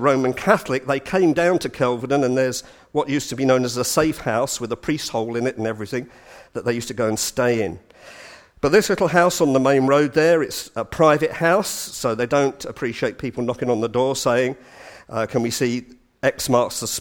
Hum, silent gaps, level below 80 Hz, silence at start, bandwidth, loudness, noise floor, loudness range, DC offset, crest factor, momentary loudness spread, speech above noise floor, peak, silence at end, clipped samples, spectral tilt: none; none; -52 dBFS; 0 s; 19.5 kHz; -20 LUFS; -44 dBFS; 6 LU; under 0.1%; 20 dB; 11 LU; 24 dB; 0 dBFS; 0 s; under 0.1%; -4.5 dB/octave